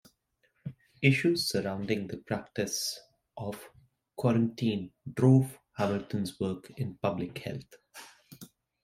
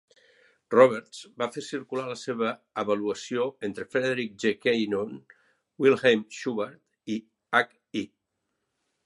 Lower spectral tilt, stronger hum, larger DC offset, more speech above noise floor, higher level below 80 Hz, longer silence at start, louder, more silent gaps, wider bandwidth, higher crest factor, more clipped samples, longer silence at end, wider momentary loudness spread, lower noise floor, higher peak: about the same, -5.5 dB/octave vs -5 dB/octave; neither; neither; second, 44 dB vs 54 dB; first, -66 dBFS vs -74 dBFS; about the same, 0.65 s vs 0.7 s; second, -31 LUFS vs -27 LUFS; neither; first, 16 kHz vs 11.5 kHz; about the same, 22 dB vs 24 dB; neither; second, 0.35 s vs 1 s; first, 24 LU vs 14 LU; second, -74 dBFS vs -80 dBFS; second, -8 dBFS vs -4 dBFS